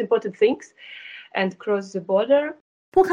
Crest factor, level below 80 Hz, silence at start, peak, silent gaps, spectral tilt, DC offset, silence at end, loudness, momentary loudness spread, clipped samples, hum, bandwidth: 18 dB; -62 dBFS; 0 s; -4 dBFS; 2.61-2.92 s; -6 dB/octave; under 0.1%; 0 s; -23 LUFS; 18 LU; under 0.1%; none; 9.6 kHz